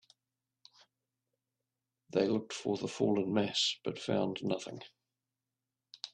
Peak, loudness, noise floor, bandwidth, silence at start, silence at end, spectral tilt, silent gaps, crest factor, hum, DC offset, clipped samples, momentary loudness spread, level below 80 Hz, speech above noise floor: -16 dBFS; -34 LUFS; -90 dBFS; 10.5 kHz; 2.15 s; 0.05 s; -4.5 dB/octave; none; 20 dB; none; under 0.1%; under 0.1%; 15 LU; -76 dBFS; 56 dB